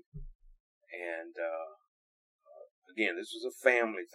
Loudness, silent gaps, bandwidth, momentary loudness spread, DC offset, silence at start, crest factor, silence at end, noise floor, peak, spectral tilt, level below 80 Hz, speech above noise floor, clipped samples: -33 LUFS; 0.35-0.39 s, 0.60-0.81 s, 1.88-2.39 s, 2.71-2.82 s; 15.5 kHz; 21 LU; under 0.1%; 0.15 s; 26 dB; 0.1 s; under -90 dBFS; -10 dBFS; -4 dB/octave; -58 dBFS; over 57 dB; under 0.1%